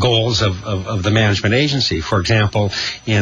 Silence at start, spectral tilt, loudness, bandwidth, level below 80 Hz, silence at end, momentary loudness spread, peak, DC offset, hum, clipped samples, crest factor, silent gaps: 0 s; -5 dB/octave; -16 LUFS; 7.6 kHz; -38 dBFS; 0 s; 5 LU; -2 dBFS; under 0.1%; none; under 0.1%; 14 dB; none